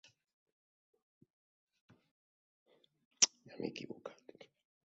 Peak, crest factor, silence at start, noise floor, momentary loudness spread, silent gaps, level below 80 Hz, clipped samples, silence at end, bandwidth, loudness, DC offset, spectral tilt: -8 dBFS; 38 dB; 3.2 s; under -90 dBFS; 20 LU; none; -88 dBFS; under 0.1%; 0.75 s; 7.6 kHz; -34 LUFS; under 0.1%; -1 dB/octave